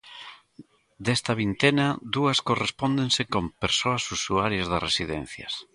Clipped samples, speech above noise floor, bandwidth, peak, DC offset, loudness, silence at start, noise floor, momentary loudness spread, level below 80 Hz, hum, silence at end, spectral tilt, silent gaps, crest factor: under 0.1%; 27 dB; 11.5 kHz; -6 dBFS; under 0.1%; -25 LUFS; 0.05 s; -52 dBFS; 11 LU; -50 dBFS; none; 0.15 s; -4 dB/octave; none; 22 dB